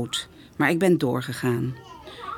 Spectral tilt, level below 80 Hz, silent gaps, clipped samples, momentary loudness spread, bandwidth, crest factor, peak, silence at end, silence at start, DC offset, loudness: -5.5 dB/octave; -58 dBFS; none; under 0.1%; 19 LU; 18 kHz; 18 dB; -6 dBFS; 0 s; 0 s; under 0.1%; -24 LUFS